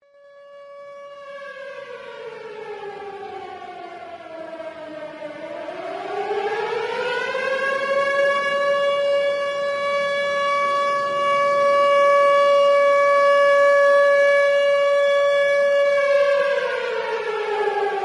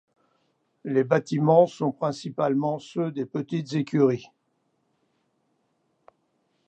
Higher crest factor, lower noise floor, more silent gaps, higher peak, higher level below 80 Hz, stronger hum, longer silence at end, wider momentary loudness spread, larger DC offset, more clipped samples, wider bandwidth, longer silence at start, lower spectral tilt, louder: second, 12 dB vs 22 dB; second, -47 dBFS vs -73 dBFS; neither; about the same, -8 dBFS vs -6 dBFS; first, -70 dBFS vs -76 dBFS; neither; second, 0 s vs 2.45 s; first, 20 LU vs 10 LU; neither; neither; first, 11 kHz vs 8.8 kHz; second, 0.4 s vs 0.85 s; second, -2.5 dB/octave vs -7.5 dB/octave; first, -18 LUFS vs -25 LUFS